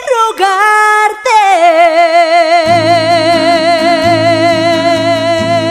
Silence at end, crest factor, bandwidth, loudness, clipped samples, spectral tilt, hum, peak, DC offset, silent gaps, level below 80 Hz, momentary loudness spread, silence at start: 0 s; 8 dB; 14.5 kHz; -8 LUFS; 0.2%; -4 dB/octave; none; 0 dBFS; 0.1%; none; -48 dBFS; 4 LU; 0 s